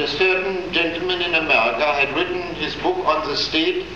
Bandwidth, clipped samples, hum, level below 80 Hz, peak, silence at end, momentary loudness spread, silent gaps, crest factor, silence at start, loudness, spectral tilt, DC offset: 7.8 kHz; under 0.1%; none; -46 dBFS; -4 dBFS; 0 s; 7 LU; none; 16 dB; 0 s; -19 LUFS; -4 dB/octave; 0.5%